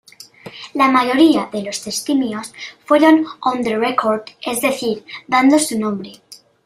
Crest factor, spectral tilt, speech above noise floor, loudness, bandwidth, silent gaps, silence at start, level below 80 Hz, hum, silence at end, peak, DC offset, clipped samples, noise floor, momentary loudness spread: 16 dB; -3.5 dB/octave; 23 dB; -16 LUFS; 16 kHz; none; 0.45 s; -62 dBFS; none; 0.3 s; -2 dBFS; under 0.1%; under 0.1%; -39 dBFS; 16 LU